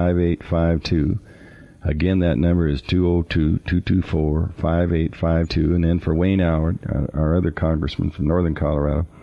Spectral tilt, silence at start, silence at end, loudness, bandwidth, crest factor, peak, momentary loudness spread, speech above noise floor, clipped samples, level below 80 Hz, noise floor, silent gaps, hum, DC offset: -9 dB/octave; 0 s; 0 s; -21 LUFS; 6.6 kHz; 12 dB; -8 dBFS; 4 LU; 25 dB; under 0.1%; -32 dBFS; -44 dBFS; none; none; under 0.1%